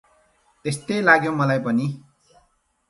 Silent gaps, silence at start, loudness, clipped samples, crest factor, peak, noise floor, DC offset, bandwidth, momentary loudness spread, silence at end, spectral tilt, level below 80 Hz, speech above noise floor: none; 0.65 s; -21 LUFS; under 0.1%; 22 dB; -2 dBFS; -65 dBFS; under 0.1%; 11.5 kHz; 14 LU; 0.9 s; -6 dB/octave; -64 dBFS; 45 dB